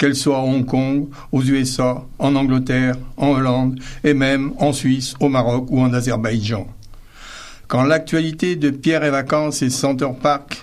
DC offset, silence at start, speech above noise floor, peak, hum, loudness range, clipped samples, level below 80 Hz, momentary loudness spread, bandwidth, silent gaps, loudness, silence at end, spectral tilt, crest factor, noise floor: under 0.1%; 0 s; 20 dB; -2 dBFS; none; 2 LU; under 0.1%; -38 dBFS; 6 LU; 14 kHz; none; -18 LUFS; 0 s; -5.5 dB/octave; 16 dB; -38 dBFS